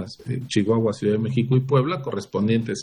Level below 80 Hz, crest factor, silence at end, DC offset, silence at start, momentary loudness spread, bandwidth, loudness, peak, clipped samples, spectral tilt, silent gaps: -60 dBFS; 16 dB; 0 s; under 0.1%; 0 s; 8 LU; 10.5 kHz; -23 LUFS; -6 dBFS; under 0.1%; -7 dB/octave; none